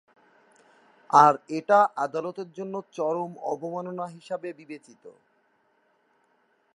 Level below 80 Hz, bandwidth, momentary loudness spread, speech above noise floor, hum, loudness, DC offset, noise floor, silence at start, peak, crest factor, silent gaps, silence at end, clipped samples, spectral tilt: -86 dBFS; 11 kHz; 19 LU; 43 dB; none; -25 LUFS; under 0.1%; -68 dBFS; 1.1 s; -2 dBFS; 26 dB; none; 1.65 s; under 0.1%; -5.5 dB/octave